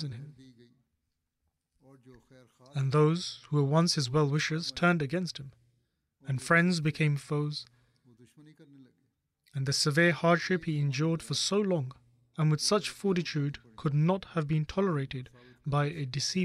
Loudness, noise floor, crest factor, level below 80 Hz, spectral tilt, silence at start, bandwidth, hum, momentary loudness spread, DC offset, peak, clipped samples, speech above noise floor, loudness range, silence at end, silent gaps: -29 LUFS; -82 dBFS; 18 dB; -64 dBFS; -5 dB/octave; 0 s; 13 kHz; none; 15 LU; under 0.1%; -14 dBFS; under 0.1%; 53 dB; 4 LU; 0 s; none